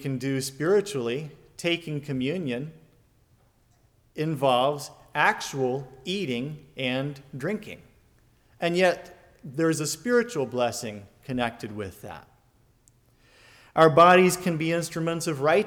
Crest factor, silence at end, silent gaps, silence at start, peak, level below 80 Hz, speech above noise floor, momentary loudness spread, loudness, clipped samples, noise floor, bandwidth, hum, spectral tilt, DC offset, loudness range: 20 dB; 0 s; none; 0 s; -6 dBFS; -62 dBFS; 38 dB; 16 LU; -25 LUFS; under 0.1%; -63 dBFS; 19 kHz; none; -5 dB/octave; under 0.1%; 9 LU